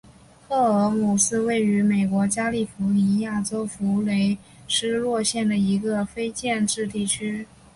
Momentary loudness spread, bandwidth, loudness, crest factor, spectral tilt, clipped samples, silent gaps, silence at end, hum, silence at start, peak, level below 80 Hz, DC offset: 6 LU; 11.5 kHz; -23 LUFS; 14 dB; -4.5 dB/octave; under 0.1%; none; 0.3 s; none; 0.5 s; -8 dBFS; -56 dBFS; under 0.1%